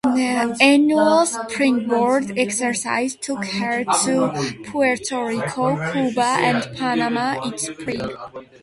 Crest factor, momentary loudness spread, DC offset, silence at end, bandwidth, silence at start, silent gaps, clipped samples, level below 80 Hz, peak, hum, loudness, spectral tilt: 20 dB; 11 LU; under 0.1%; 0.2 s; 11.5 kHz; 0.05 s; none; under 0.1%; -58 dBFS; 0 dBFS; none; -20 LUFS; -4 dB/octave